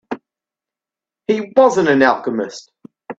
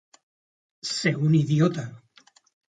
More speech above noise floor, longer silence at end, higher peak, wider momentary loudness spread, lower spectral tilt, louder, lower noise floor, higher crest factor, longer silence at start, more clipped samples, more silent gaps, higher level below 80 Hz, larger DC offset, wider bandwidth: first, 74 dB vs 36 dB; second, 0.05 s vs 0.85 s; first, 0 dBFS vs -8 dBFS; first, 18 LU vs 15 LU; about the same, -5.5 dB/octave vs -6 dB/octave; first, -15 LUFS vs -24 LUFS; first, -88 dBFS vs -58 dBFS; about the same, 18 dB vs 18 dB; second, 0.1 s vs 0.85 s; neither; neither; first, -62 dBFS vs -68 dBFS; neither; second, 8 kHz vs 9.2 kHz